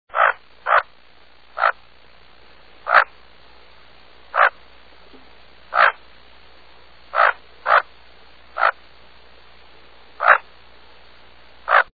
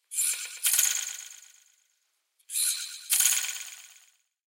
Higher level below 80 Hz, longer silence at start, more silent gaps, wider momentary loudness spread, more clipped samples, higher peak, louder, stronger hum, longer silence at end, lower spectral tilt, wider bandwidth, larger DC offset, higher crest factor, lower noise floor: first, -60 dBFS vs under -90 dBFS; about the same, 0.15 s vs 0.1 s; neither; first, 21 LU vs 18 LU; neither; first, 0 dBFS vs -8 dBFS; first, -18 LUFS vs -25 LUFS; neither; second, 0.1 s vs 0.65 s; first, -3.5 dB/octave vs 9.5 dB/octave; second, 4.9 kHz vs 17 kHz; first, 0.6% vs under 0.1%; about the same, 22 dB vs 22 dB; second, -52 dBFS vs -75 dBFS